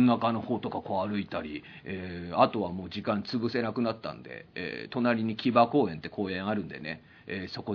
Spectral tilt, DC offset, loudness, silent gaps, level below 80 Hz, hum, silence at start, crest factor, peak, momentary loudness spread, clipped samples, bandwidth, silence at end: -8 dB/octave; under 0.1%; -30 LUFS; none; -64 dBFS; none; 0 s; 22 dB; -8 dBFS; 14 LU; under 0.1%; 5.4 kHz; 0 s